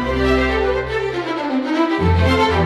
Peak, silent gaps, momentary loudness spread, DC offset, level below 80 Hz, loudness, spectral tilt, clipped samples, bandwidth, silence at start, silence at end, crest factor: -4 dBFS; none; 6 LU; under 0.1%; -28 dBFS; -18 LUFS; -6.5 dB/octave; under 0.1%; 11.5 kHz; 0 s; 0 s; 12 dB